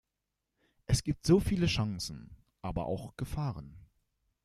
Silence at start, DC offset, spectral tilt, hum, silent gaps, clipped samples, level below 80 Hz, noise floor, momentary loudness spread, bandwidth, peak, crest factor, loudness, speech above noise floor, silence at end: 0.9 s; under 0.1%; -6 dB/octave; none; none; under 0.1%; -48 dBFS; -86 dBFS; 19 LU; 15 kHz; -12 dBFS; 22 dB; -32 LUFS; 55 dB; 0.65 s